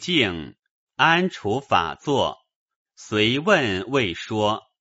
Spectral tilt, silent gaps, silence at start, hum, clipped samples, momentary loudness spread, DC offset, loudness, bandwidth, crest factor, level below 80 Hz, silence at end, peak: -2.5 dB/octave; 0.59-0.63 s, 0.71-0.87 s, 2.56-2.68 s, 2.76-2.85 s; 0 s; none; under 0.1%; 9 LU; under 0.1%; -22 LUFS; 8 kHz; 20 dB; -54 dBFS; 0.2 s; -2 dBFS